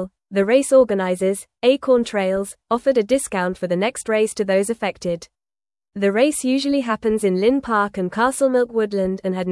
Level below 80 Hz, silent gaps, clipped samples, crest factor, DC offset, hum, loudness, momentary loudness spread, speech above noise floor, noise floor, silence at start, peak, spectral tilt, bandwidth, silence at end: -54 dBFS; none; under 0.1%; 16 dB; under 0.1%; none; -19 LUFS; 7 LU; over 71 dB; under -90 dBFS; 0 s; -4 dBFS; -5 dB/octave; 12 kHz; 0 s